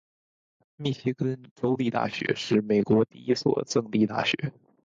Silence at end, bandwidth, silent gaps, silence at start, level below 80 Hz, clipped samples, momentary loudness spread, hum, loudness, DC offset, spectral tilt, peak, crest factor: 0.35 s; 7.6 kHz; 1.51-1.56 s; 0.8 s; -64 dBFS; under 0.1%; 8 LU; none; -27 LUFS; under 0.1%; -6 dB/octave; -8 dBFS; 18 dB